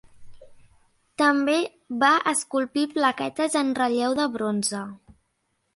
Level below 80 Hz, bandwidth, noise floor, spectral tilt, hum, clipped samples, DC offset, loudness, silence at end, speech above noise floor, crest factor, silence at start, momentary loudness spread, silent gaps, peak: -64 dBFS; 11.5 kHz; -73 dBFS; -3 dB/octave; none; under 0.1%; under 0.1%; -23 LUFS; 0.8 s; 50 dB; 20 dB; 0.2 s; 8 LU; none; -6 dBFS